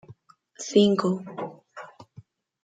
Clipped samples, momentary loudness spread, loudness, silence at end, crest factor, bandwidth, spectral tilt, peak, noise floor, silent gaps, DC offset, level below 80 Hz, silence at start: under 0.1%; 24 LU; -24 LUFS; 0.6 s; 22 dB; 9.2 kHz; -5.5 dB/octave; -6 dBFS; -52 dBFS; none; under 0.1%; -72 dBFS; 0.1 s